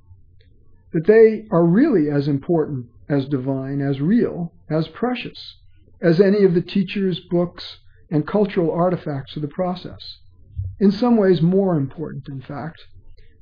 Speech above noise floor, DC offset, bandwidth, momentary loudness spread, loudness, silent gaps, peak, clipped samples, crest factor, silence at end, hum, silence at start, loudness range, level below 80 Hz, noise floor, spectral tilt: 30 dB; under 0.1%; 5.2 kHz; 17 LU; -19 LUFS; none; -2 dBFS; under 0.1%; 18 dB; 0.2 s; none; 0.95 s; 5 LU; -48 dBFS; -49 dBFS; -10 dB/octave